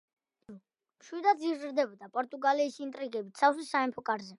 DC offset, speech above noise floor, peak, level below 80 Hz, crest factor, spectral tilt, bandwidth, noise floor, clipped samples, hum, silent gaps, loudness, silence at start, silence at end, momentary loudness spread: under 0.1%; 25 dB; -10 dBFS; -84 dBFS; 22 dB; -4 dB/octave; 11.5 kHz; -56 dBFS; under 0.1%; none; none; -31 LUFS; 0.5 s; 0.05 s; 10 LU